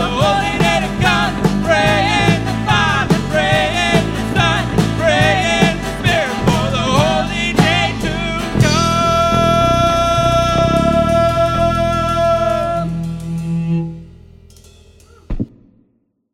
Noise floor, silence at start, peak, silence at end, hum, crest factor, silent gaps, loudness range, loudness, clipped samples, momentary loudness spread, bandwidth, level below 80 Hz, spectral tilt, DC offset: -62 dBFS; 0 s; 0 dBFS; 0.85 s; none; 14 dB; none; 6 LU; -14 LUFS; under 0.1%; 7 LU; 16 kHz; -30 dBFS; -5 dB/octave; under 0.1%